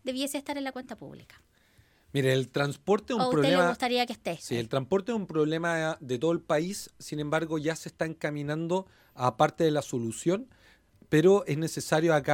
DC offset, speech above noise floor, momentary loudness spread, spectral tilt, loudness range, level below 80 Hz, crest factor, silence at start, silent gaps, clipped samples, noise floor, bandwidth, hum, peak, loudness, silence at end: under 0.1%; 35 dB; 11 LU; -5.5 dB/octave; 4 LU; -64 dBFS; 22 dB; 0.05 s; none; under 0.1%; -63 dBFS; 17 kHz; none; -8 dBFS; -28 LUFS; 0 s